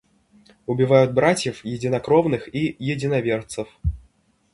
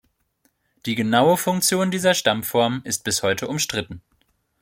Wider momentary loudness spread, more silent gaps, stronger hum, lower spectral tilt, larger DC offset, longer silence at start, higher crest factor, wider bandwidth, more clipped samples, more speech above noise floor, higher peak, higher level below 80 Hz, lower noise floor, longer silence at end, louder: first, 13 LU vs 10 LU; neither; neither; first, -6 dB/octave vs -3.5 dB/octave; neither; second, 0.7 s vs 0.85 s; about the same, 20 dB vs 20 dB; second, 11.5 kHz vs 16.5 kHz; neither; second, 40 dB vs 46 dB; about the same, -2 dBFS vs -2 dBFS; first, -40 dBFS vs -58 dBFS; second, -60 dBFS vs -67 dBFS; about the same, 0.55 s vs 0.65 s; about the same, -21 LUFS vs -20 LUFS